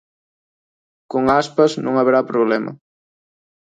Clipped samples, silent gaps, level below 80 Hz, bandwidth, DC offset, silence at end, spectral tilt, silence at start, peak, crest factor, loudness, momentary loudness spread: under 0.1%; none; -58 dBFS; 9.2 kHz; under 0.1%; 1.05 s; -6 dB/octave; 1.1 s; -4 dBFS; 16 dB; -17 LUFS; 7 LU